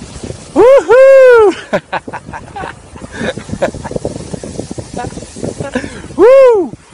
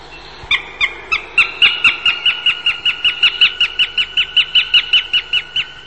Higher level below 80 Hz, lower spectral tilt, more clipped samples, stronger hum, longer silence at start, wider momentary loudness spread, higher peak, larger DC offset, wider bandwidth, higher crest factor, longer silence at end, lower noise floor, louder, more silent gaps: first, -38 dBFS vs -46 dBFS; first, -5.5 dB/octave vs 0 dB/octave; first, 0.7% vs under 0.1%; neither; about the same, 0 s vs 0 s; first, 21 LU vs 7 LU; about the same, 0 dBFS vs 0 dBFS; second, under 0.1% vs 0.6%; first, 11 kHz vs 8.8 kHz; second, 10 dB vs 16 dB; first, 0.25 s vs 0 s; second, -29 dBFS vs -34 dBFS; first, -8 LUFS vs -12 LUFS; neither